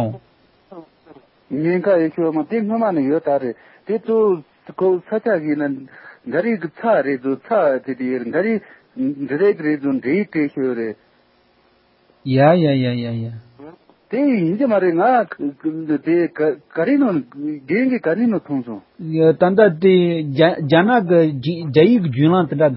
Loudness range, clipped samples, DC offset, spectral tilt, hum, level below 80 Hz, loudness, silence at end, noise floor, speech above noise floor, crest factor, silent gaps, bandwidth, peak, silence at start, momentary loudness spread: 5 LU; under 0.1%; under 0.1%; -12.5 dB/octave; none; -64 dBFS; -18 LUFS; 0 s; -57 dBFS; 40 dB; 18 dB; none; 5.8 kHz; 0 dBFS; 0 s; 12 LU